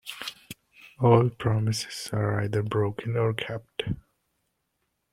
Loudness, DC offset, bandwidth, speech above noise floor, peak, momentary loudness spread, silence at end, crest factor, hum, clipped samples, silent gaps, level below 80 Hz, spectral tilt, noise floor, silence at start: -27 LUFS; under 0.1%; 15.5 kHz; 52 dB; -6 dBFS; 16 LU; 1.2 s; 22 dB; none; under 0.1%; none; -56 dBFS; -6 dB/octave; -77 dBFS; 0.05 s